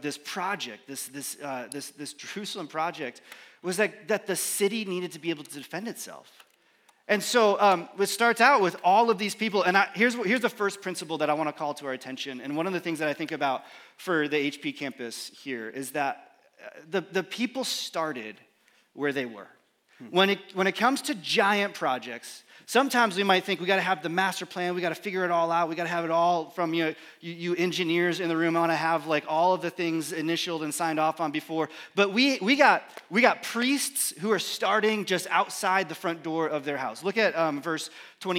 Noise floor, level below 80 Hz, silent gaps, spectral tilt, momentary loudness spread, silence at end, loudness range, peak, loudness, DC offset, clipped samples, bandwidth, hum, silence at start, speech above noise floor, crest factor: -64 dBFS; under -90 dBFS; none; -3.5 dB/octave; 14 LU; 0 s; 8 LU; -4 dBFS; -27 LUFS; under 0.1%; under 0.1%; 17 kHz; none; 0 s; 36 dB; 22 dB